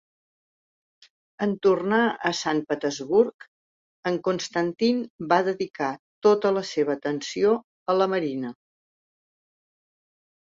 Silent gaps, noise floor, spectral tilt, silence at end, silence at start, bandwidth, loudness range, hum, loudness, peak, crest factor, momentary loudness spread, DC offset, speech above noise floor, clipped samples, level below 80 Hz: 3.34-3.39 s, 3.48-4.03 s, 5.10-5.19 s, 5.70-5.74 s, 5.99-6.22 s, 7.64-7.86 s; under -90 dBFS; -5 dB/octave; 1.95 s; 1.4 s; 7.8 kHz; 3 LU; none; -25 LUFS; -6 dBFS; 20 dB; 8 LU; under 0.1%; over 66 dB; under 0.1%; -70 dBFS